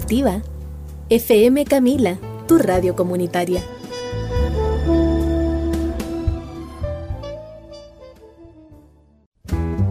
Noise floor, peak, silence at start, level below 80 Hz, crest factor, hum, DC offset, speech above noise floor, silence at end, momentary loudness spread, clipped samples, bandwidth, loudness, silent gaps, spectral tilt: -50 dBFS; -4 dBFS; 0 s; -28 dBFS; 16 dB; none; under 0.1%; 34 dB; 0 s; 19 LU; under 0.1%; 16 kHz; -19 LUFS; 9.26-9.32 s; -7 dB/octave